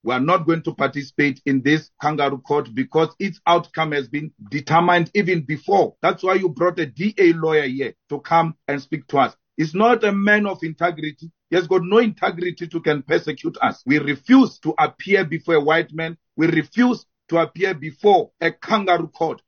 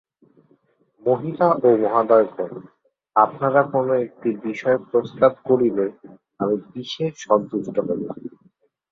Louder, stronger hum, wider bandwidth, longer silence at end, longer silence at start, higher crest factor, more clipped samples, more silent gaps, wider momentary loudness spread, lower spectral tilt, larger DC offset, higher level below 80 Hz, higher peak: about the same, -20 LUFS vs -21 LUFS; neither; about the same, 6.8 kHz vs 7.4 kHz; second, 0.1 s vs 0.65 s; second, 0.05 s vs 1.05 s; about the same, 18 dB vs 20 dB; neither; neither; about the same, 10 LU vs 11 LU; about the same, -6.5 dB/octave vs -7 dB/octave; neither; about the same, -66 dBFS vs -66 dBFS; about the same, -2 dBFS vs 0 dBFS